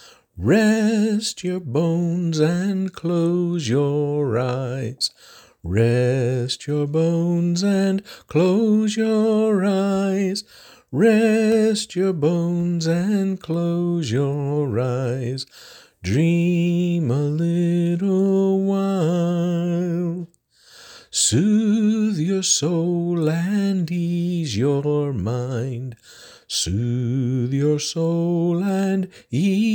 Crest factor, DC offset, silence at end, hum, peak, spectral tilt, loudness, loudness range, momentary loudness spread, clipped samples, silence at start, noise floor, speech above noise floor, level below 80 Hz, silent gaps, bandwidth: 14 dB; under 0.1%; 0 s; none; -6 dBFS; -6 dB/octave; -21 LUFS; 3 LU; 7 LU; under 0.1%; 0.35 s; -52 dBFS; 32 dB; -54 dBFS; none; 17 kHz